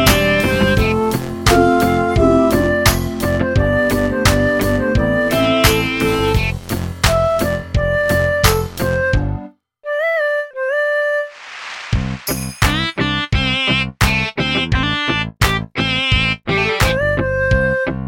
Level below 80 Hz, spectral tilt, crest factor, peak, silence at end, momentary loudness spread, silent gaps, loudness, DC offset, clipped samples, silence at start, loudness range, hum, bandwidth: -26 dBFS; -5 dB/octave; 16 dB; 0 dBFS; 0 s; 7 LU; none; -16 LUFS; under 0.1%; under 0.1%; 0 s; 4 LU; none; 17 kHz